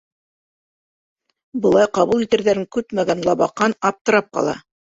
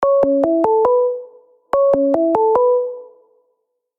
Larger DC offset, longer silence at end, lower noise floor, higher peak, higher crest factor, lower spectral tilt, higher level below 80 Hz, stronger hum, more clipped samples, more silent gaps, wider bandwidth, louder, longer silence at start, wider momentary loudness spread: neither; second, 0.35 s vs 0.95 s; first, under -90 dBFS vs -70 dBFS; about the same, -2 dBFS vs -2 dBFS; about the same, 18 dB vs 14 dB; second, -5 dB/octave vs -8.5 dB/octave; about the same, -56 dBFS vs -56 dBFS; neither; neither; first, 4.01-4.05 s vs none; first, 8 kHz vs 4 kHz; about the same, -18 LUFS vs -16 LUFS; first, 1.55 s vs 0 s; about the same, 8 LU vs 9 LU